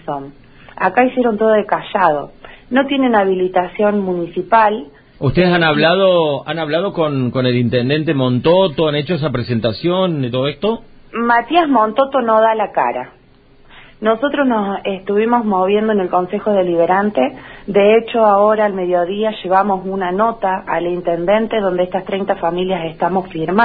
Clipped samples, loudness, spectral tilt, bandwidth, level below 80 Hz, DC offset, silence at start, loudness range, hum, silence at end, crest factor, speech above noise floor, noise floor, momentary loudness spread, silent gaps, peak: under 0.1%; -15 LUFS; -11 dB/octave; 5 kHz; -46 dBFS; under 0.1%; 0.05 s; 3 LU; none; 0 s; 16 dB; 32 dB; -47 dBFS; 8 LU; none; 0 dBFS